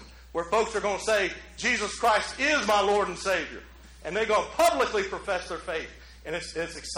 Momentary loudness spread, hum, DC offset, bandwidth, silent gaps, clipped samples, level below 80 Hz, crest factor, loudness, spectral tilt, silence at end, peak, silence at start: 12 LU; none; under 0.1%; 19 kHz; none; under 0.1%; -50 dBFS; 18 dB; -27 LUFS; -2.5 dB/octave; 0 s; -10 dBFS; 0 s